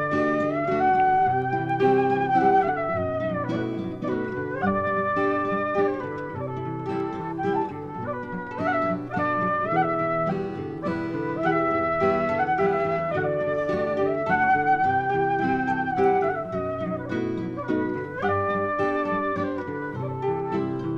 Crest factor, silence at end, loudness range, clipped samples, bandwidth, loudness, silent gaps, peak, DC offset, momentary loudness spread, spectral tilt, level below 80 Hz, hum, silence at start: 16 dB; 0 s; 4 LU; under 0.1%; 7.2 kHz; -25 LUFS; none; -8 dBFS; under 0.1%; 9 LU; -8.5 dB/octave; -56 dBFS; none; 0 s